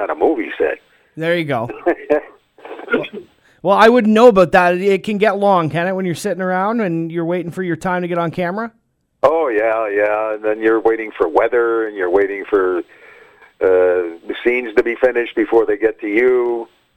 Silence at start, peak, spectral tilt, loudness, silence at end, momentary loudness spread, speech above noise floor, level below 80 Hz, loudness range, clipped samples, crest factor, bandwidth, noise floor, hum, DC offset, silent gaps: 0 s; 0 dBFS; -6.5 dB/octave; -16 LUFS; 0.3 s; 10 LU; 30 dB; -52 dBFS; 6 LU; under 0.1%; 16 dB; 15 kHz; -45 dBFS; none; under 0.1%; none